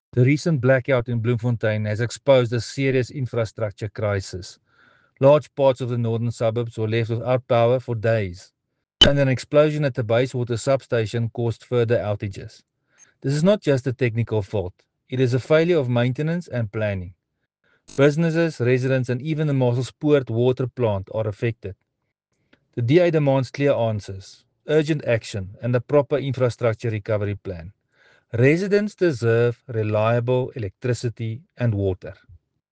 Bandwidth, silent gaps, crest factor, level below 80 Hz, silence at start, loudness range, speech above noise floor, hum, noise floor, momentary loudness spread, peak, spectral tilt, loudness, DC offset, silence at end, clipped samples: 9.2 kHz; none; 20 dB; -50 dBFS; 0.15 s; 3 LU; 56 dB; none; -77 dBFS; 12 LU; -2 dBFS; -6.5 dB/octave; -22 LUFS; under 0.1%; 0.6 s; under 0.1%